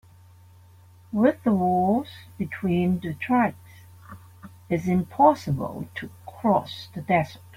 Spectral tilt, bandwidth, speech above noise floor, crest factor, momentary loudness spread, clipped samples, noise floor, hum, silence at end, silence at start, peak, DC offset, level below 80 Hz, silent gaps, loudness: -8 dB/octave; 16 kHz; 28 dB; 20 dB; 16 LU; under 0.1%; -51 dBFS; none; 0.2 s; 1.1 s; -4 dBFS; under 0.1%; -56 dBFS; none; -24 LUFS